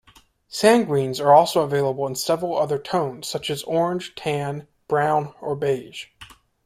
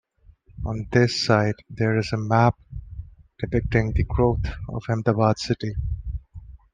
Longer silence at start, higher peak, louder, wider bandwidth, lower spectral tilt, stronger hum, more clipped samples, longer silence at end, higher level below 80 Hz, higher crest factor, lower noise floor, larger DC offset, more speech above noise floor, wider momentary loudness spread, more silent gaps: about the same, 0.5 s vs 0.55 s; about the same, -2 dBFS vs -2 dBFS; about the same, -22 LUFS vs -23 LUFS; first, 16 kHz vs 9.4 kHz; second, -5 dB/octave vs -6.5 dB/octave; neither; neither; first, 0.4 s vs 0.15 s; second, -62 dBFS vs -36 dBFS; about the same, 20 dB vs 20 dB; about the same, -55 dBFS vs -54 dBFS; neither; about the same, 34 dB vs 32 dB; about the same, 14 LU vs 16 LU; neither